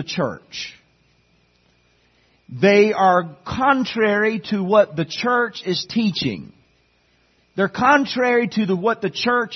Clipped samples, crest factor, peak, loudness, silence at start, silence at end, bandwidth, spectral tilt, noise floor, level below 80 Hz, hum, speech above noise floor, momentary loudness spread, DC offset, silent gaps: under 0.1%; 18 dB; -2 dBFS; -19 LUFS; 0 s; 0 s; 6.4 kHz; -5.5 dB/octave; -61 dBFS; -58 dBFS; none; 42 dB; 14 LU; under 0.1%; none